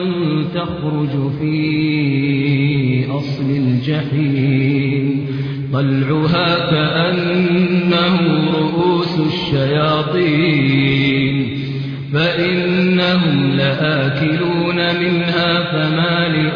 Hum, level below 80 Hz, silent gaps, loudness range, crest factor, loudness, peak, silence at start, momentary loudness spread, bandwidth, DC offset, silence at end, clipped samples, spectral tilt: none; -46 dBFS; none; 2 LU; 12 dB; -16 LUFS; -2 dBFS; 0 s; 5 LU; 5.4 kHz; under 0.1%; 0 s; under 0.1%; -8.5 dB/octave